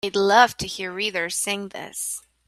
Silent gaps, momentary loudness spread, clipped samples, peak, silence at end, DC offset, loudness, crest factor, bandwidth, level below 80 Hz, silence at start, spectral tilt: none; 13 LU; under 0.1%; -2 dBFS; 0.3 s; under 0.1%; -22 LUFS; 22 dB; 15.5 kHz; -58 dBFS; 0.05 s; -2 dB/octave